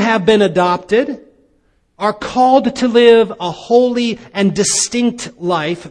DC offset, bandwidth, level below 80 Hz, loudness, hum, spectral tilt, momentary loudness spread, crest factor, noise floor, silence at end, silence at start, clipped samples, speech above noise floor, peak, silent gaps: under 0.1%; 10.5 kHz; -50 dBFS; -14 LUFS; none; -4 dB/octave; 10 LU; 14 dB; -58 dBFS; 0 s; 0 s; under 0.1%; 44 dB; 0 dBFS; none